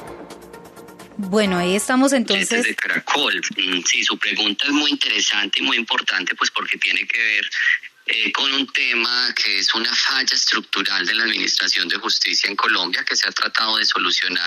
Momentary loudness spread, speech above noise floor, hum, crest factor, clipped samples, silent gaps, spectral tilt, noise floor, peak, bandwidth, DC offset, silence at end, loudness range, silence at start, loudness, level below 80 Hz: 3 LU; 21 dB; none; 14 dB; under 0.1%; none; -1.5 dB/octave; -41 dBFS; -6 dBFS; 13.5 kHz; under 0.1%; 0 s; 1 LU; 0 s; -17 LUFS; -66 dBFS